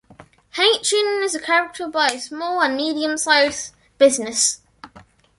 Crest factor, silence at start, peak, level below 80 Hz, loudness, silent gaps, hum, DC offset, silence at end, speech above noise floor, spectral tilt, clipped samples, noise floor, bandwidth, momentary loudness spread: 20 dB; 0.55 s; -2 dBFS; -62 dBFS; -18 LUFS; none; none; under 0.1%; 0.4 s; 30 dB; 0 dB/octave; under 0.1%; -49 dBFS; 11.5 kHz; 10 LU